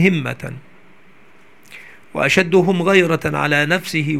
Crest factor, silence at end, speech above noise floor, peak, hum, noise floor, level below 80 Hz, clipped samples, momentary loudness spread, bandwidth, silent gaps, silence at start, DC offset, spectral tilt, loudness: 18 dB; 0 s; 34 dB; 0 dBFS; none; -50 dBFS; -54 dBFS; under 0.1%; 16 LU; 15.5 kHz; none; 0 s; 0.6%; -5.5 dB/octave; -16 LUFS